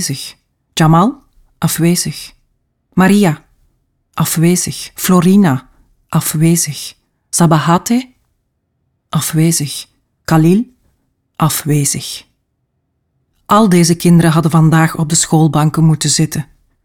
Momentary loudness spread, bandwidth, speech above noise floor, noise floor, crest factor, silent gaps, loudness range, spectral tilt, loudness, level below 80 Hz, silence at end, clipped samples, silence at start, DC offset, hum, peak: 15 LU; 17.5 kHz; 55 dB; -66 dBFS; 12 dB; none; 5 LU; -5 dB/octave; -12 LUFS; -48 dBFS; 0.4 s; under 0.1%; 0 s; under 0.1%; none; 0 dBFS